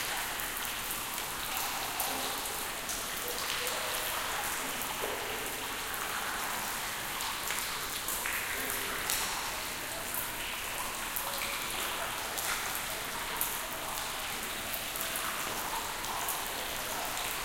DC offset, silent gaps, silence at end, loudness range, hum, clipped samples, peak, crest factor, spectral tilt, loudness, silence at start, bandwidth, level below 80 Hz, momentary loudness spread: under 0.1%; none; 0 s; 1 LU; none; under 0.1%; -10 dBFS; 26 dB; -0.5 dB/octave; -33 LUFS; 0 s; 17 kHz; -54 dBFS; 3 LU